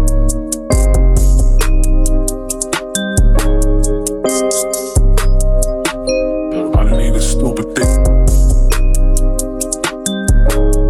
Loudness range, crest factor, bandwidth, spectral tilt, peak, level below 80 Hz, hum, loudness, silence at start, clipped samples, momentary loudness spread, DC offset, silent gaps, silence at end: 1 LU; 10 dB; 13.5 kHz; -5 dB/octave; -2 dBFS; -12 dBFS; none; -15 LUFS; 0 s; under 0.1%; 5 LU; under 0.1%; none; 0 s